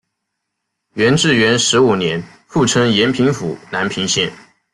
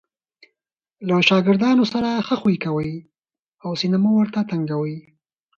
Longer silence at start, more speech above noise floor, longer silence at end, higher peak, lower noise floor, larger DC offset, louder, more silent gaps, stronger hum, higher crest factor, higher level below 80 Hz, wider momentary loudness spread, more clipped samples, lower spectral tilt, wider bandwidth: about the same, 0.95 s vs 1 s; second, 61 dB vs 65 dB; second, 0.4 s vs 0.55 s; about the same, -2 dBFS vs -2 dBFS; second, -75 dBFS vs -84 dBFS; neither; first, -15 LUFS vs -20 LUFS; second, none vs 3.48-3.52 s; neither; second, 14 dB vs 20 dB; first, -52 dBFS vs -60 dBFS; second, 10 LU vs 14 LU; neither; second, -4 dB/octave vs -6.5 dB/octave; first, 12 kHz vs 7.2 kHz